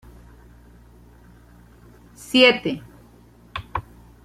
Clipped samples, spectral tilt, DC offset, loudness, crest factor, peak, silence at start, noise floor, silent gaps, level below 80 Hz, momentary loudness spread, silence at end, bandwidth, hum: under 0.1%; -4 dB/octave; under 0.1%; -19 LUFS; 24 dB; -2 dBFS; 2.3 s; -50 dBFS; none; -50 dBFS; 21 LU; 0.45 s; 15 kHz; none